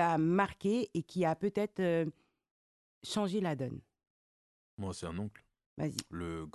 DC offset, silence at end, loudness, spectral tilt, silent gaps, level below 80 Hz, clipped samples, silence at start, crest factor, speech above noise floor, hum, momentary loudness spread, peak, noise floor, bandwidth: under 0.1%; 0.05 s; -35 LUFS; -6 dB/octave; 2.51-3.01 s, 4.10-4.77 s, 5.66-5.76 s; -60 dBFS; under 0.1%; 0 s; 20 dB; over 56 dB; none; 12 LU; -16 dBFS; under -90 dBFS; 12.5 kHz